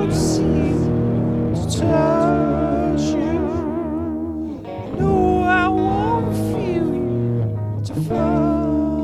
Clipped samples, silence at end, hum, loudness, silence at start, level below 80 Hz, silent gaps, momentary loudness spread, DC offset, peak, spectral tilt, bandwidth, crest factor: under 0.1%; 0 s; none; -19 LUFS; 0 s; -34 dBFS; none; 8 LU; under 0.1%; -4 dBFS; -7 dB/octave; 13.5 kHz; 14 dB